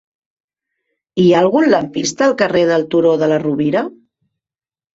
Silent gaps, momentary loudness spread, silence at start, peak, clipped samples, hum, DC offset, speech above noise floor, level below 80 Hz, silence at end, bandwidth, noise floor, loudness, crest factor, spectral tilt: none; 8 LU; 1.15 s; -2 dBFS; under 0.1%; none; under 0.1%; over 77 dB; -56 dBFS; 1.05 s; 8 kHz; under -90 dBFS; -14 LUFS; 14 dB; -5.5 dB/octave